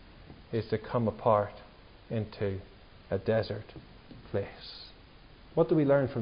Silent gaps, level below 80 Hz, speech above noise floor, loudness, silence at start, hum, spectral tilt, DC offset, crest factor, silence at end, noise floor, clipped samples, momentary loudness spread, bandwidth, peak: none; -54 dBFS; 24 dB; -31 LUFS; 0.2 s; none; -11 dB/octave; under 0.1%; 20 dB; 0 s; -54 dBFS; under 0.1%; 24 LU; 5.4 kHz; -12 dBFS